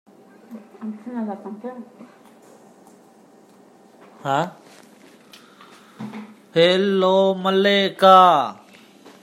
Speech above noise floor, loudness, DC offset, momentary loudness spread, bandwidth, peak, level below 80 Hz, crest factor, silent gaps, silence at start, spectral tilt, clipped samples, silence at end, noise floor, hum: 33 dB; -17 LUFS; under 0.1%; 23 LU; 15.5 kHz; -2 dBFS; -76 dBFS; 20 dB; none; 0.5 s; -5.5 dB/octave; under 0.1%; 0.7 s; -51 dBFS; none